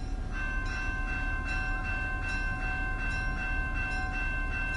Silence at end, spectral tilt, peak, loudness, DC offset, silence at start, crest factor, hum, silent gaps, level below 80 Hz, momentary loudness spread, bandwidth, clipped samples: 0 s; -5.5 dB/octave; -20 dBFS; -33 LUFS; under 0.1%; 0 s; 12 dB; none; none; -34 dBFS; 1 LU; 10.5 kHz; under 0.1%